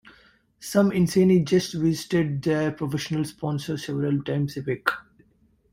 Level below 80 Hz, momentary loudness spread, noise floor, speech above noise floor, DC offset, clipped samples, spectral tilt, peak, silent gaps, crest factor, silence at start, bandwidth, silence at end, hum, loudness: -56 dBFS; 10 LU; -63 dBFS; 39 dB; under 0.1%; under 0.1%; -6.5 dB/octave; -4 dBFS; none; 20 dB; 0.05 s; 16 kHz; 0.7 s; none; -24 LUFS